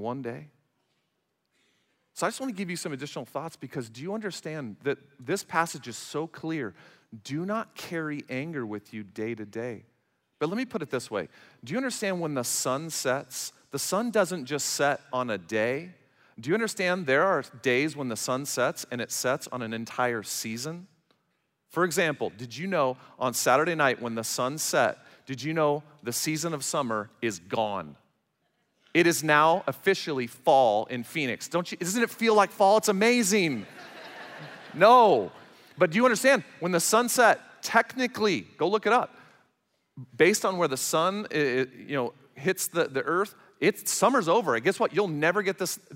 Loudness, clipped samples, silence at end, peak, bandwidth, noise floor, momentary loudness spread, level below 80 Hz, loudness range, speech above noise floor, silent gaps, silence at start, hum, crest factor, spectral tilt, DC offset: -27 LUFS; under 0.1%; 0 s; -6 dBFS; 16 kHz; -78 dBFS; 15 LU; -78 dBFS; 11 LU; 51 dB; none; 0 s; none; 22 dB; -3.5 dB/octave; under 0.1%